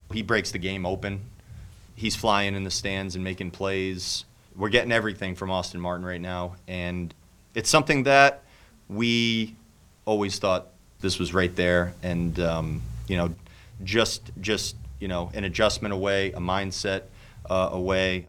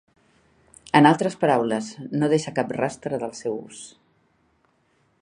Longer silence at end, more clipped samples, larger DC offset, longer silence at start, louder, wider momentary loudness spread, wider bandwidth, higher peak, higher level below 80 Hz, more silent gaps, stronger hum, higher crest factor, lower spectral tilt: second, 0 s vs 1.35 s; neither; neither; second, 0.1 s vs 0.95 s; second, -26 LUFS vs -22 LUFS; second, 12 LU vs 16 LU; first, 17 kHz vs 10.5 kHz; about the same, -2 dBFS vs 0 dBFS; first, -46 dBFS vs -66 dBFS; neither; neither; about the same, 26 dB vs 24 dB; second, -4 dB/octave vs -5.5 dB/octave